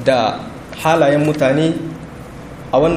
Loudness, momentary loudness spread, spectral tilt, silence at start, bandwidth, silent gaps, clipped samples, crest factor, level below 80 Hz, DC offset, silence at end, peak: -16 LUFS; 20 LU; -6 dB/octave; 0 s; 15.5 kHz; none; under 0.1%; 16 dB; -42 dBFS; under 0.1%; 0 s; 0 dBFS